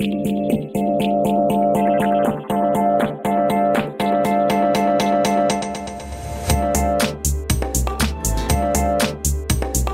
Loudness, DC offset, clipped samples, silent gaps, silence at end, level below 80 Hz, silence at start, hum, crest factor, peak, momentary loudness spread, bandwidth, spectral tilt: -19 LUFS; under 0.1%; under 0.1%; none; 0 s; -28 dBFS; 0 s; none; 14 dB; -4 dBFS; 5 LU; 16.5 kHz; -5 dB/octave